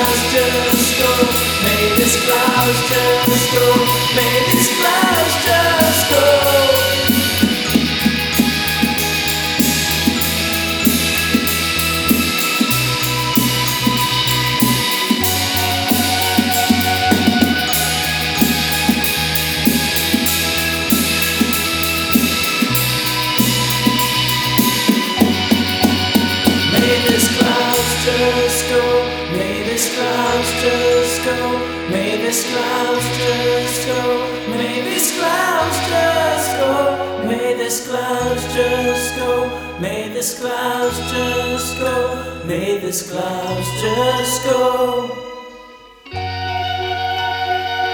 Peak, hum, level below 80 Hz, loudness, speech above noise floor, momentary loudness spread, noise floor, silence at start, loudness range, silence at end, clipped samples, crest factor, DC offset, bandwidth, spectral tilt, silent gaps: 0 dBFS; none; -38 dBFS; -15 LUFS; 25 dB; 7 LU; -40 dBFS; 0 s; 6 LU; 0 s; under 0.1%; 16 dB; under 0.1%; over 20 kHz; -3 dB/octave; none